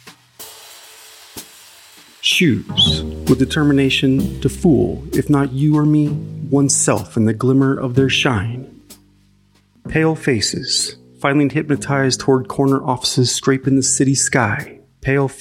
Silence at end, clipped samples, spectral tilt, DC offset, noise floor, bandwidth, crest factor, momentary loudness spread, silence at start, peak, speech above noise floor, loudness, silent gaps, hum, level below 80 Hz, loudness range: 0 s; under 0.1%; -4.5 dB/octave; under 0.1%; -55 dBFS; 17 kHz; 16 dB; 12 LU; 0.05 s; 0 dBFS; 39 dB; -16 LUFS; none; none; -40 dBFS; 4 LU